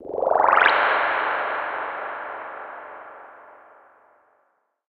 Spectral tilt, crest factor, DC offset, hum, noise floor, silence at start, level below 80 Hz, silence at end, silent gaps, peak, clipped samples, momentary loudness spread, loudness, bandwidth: -4.5 dB/octave; 24 dB; under 0.1%; none; -68 dBFS; 0 s; -68 dBFS; 1.35 s; none; 0 dBFS; under 0.1%; 23 LU; -21 LUFS; 6.2 kHz